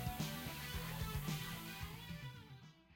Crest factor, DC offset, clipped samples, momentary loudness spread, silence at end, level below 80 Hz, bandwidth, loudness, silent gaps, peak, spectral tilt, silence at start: 16 dB; under 0.1%; under 0.1%; 12 LU; 0 s; -54 dBFS; 17 kHz; -45 LUFS; none; -30 dBFS; -4.5 dB/octave; 0 s